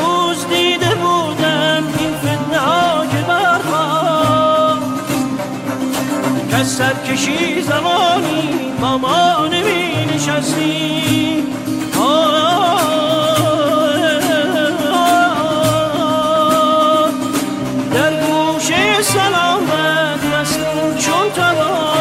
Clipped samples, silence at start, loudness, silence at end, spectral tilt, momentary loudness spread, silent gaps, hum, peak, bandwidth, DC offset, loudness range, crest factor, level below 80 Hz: under 0.1%; 0 s; -14 LUFS; 0 s; -4 dB/octave; 6 LU; none; none; -2 dBFS; 16.5 kHz; under 0.1%; 2 LU; 12 dB; -48 dBFS